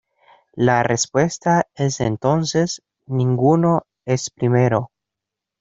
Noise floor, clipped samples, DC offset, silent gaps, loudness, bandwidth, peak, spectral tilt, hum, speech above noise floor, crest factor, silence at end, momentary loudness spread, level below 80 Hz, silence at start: -84 dBFS; under 0.1%; under 0.1%; none; -19 LUFS; 7.8 kHz; 0 dBFS; -5.5 dB/octave; none; 66 dB; 20 dB; 0.75 s; 8 LU; -54 dBFS; 0.55 s